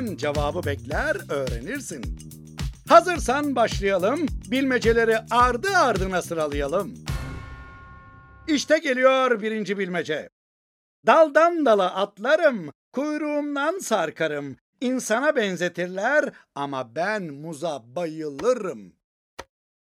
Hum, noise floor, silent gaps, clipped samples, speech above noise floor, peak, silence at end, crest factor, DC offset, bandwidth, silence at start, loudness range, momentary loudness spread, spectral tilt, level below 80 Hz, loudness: none; -47 dBFS; 10.32-11.03 s, 12.75-12.92 s, 14.61-14.73 s, 19.04-19.37 s; under 0.1%; 24 dB; -2 dBFS; 0.45 s; 22 dB; under 0.1%; 16.5 kHz; 0 s; 5 LU; 15 LU; -4.5 dB/octave; -42 dBFS; -23 LUFS